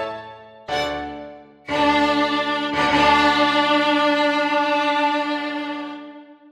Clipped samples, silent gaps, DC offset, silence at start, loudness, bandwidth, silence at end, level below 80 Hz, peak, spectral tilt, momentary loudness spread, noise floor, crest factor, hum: under 0.1%; none; under 0.1%; 0 s; -19 LUFS; 12.5 kHz; 0.2 s; -50 dBFS; -4 dBFS; -4 dB/octave; 20 LU; -41 dBFS; 16 dB; none